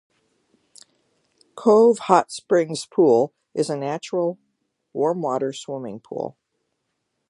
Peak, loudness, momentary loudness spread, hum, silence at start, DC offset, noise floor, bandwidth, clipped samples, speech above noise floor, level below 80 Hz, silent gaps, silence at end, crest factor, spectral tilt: 0 dBFS; -21 LUFS; 16 LU; none; 1.55 s; under 0.1%; -76 dBFS; 11.5 kHz; under 0.1%; 56 dB; -76 dBFS; none; 1 s; 22 dB; -5.5 dB/octave